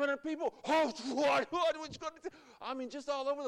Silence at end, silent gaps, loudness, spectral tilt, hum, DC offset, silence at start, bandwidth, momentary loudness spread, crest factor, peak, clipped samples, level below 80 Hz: 0 s; none; -35 LUFS; -3.5 dB/octave; none; under 0.1%; 0 s; 13 kHz; 12 LU; 12 dB; -22 dBFS; under 0.1%; -74 dBFS